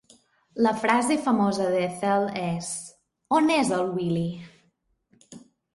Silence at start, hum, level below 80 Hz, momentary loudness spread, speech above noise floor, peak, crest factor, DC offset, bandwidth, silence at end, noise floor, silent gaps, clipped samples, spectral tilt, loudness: 0.55 s; none; -66 dBFS; 12 LU; 45 dB; -8 dBFS; 18 dB; under 0.1%; 11.5 kHz; 0.35 s; -69 dBFS; none; under 0.1%; -5 dB/octave; -25 LUFS